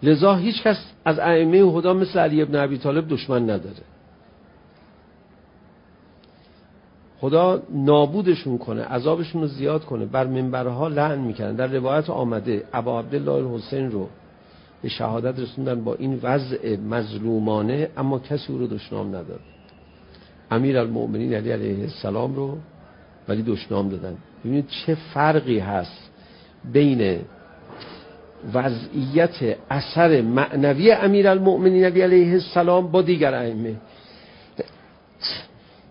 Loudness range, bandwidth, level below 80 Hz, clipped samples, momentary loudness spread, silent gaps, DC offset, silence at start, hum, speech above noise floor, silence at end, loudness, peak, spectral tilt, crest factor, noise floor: 9 LU; 5.4 kHz; -54 dBFS; under 0.1%; 15 LU; none; under 0.1%; 0 s; none; 31 dB; 0.45 s; -21 LUFS; -2 dBFS; -11.5 dB/octave; 20 dB; -52 dBFS